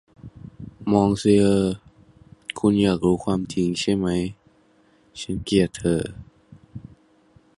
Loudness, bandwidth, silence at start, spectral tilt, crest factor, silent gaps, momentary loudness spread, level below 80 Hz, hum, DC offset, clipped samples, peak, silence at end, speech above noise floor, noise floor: -22 LUFS; 11.5 kHz; 0.25 s; -6.5 dB/octave; 20 dB; none; 24 LU; -46 dBFS; none; under 0.1%; under 0.1%; -4 dBFS; 0.8 s; 38 dB; -58 dBFS